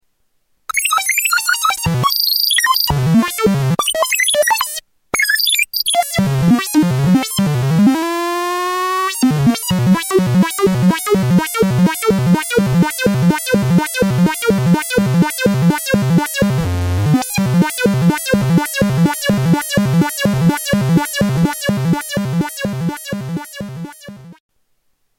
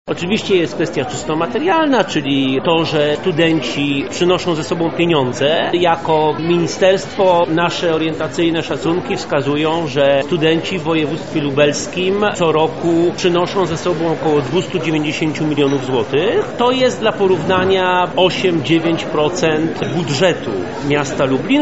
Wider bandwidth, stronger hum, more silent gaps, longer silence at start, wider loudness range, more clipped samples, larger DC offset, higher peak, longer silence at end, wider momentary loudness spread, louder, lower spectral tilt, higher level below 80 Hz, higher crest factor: first, 17 kHz vs 8 kHz; neither; neither; first, 0.75 s vs 0.05 s; about the same, 3 LU vs 2 LU; neither; second, under 0.1% vs 1%; about the same, -2 dBFS vs 0 dBFS; first, 0.85 s vs 0 s; about the same, 6 LU vs 5 LU; about the same, -15 LUFS vs -16 LUFS; about the same, -4.5 dB/octave vs -4 dB/octave; first, -40 dBFS vs -48 dBFS; about the same, 14 dB vs 16 dB